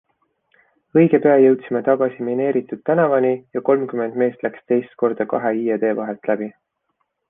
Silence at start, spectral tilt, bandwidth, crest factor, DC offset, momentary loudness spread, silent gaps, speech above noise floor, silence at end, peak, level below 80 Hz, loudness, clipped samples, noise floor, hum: 0.95 s; -11 dB/octave; 3.7 kHz; 16 dB; under 0.1%; 9 LU; none; 54 dB; 0.8 s; -2 dBFS; -66 dBFS; -19 LUFS; under 0.1%; -72 dBFS; none